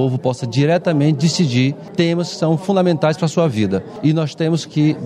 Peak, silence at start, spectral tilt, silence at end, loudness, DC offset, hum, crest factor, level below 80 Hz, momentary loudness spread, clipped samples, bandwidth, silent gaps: -2 dBFS; 0 s; -6.5 dB/octave; 0 s; -17 LUFS; under 0.1%; none; 14 dB; -58 dBFS; 4 LU; under 0.1%; 10.5 kHz; none